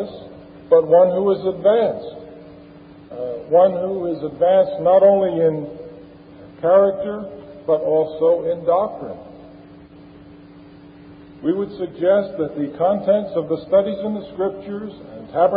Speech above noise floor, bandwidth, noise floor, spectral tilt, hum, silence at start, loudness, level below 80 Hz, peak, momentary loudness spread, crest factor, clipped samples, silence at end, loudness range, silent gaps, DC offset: 25 dB; 4.8 kHz; -43 dBFS; -11.5 dB/octave; none; 0 s; -18 LUFS; -56 dBFS; -2 dBFS; 19 LU; 16 dB; under 0.1%; 0 s; 7 LU; none; under 0.1%